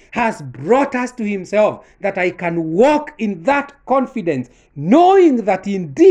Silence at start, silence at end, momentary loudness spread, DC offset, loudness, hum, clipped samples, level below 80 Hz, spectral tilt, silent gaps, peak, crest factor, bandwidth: 0.15 s; 0 s; 12 LU; under 0.1%; -16 LUFS; none; under 0.1%; -54 dBFS; -6.5 dB/octave; none; 0 dBFS; 14 dB; 9.8 kHz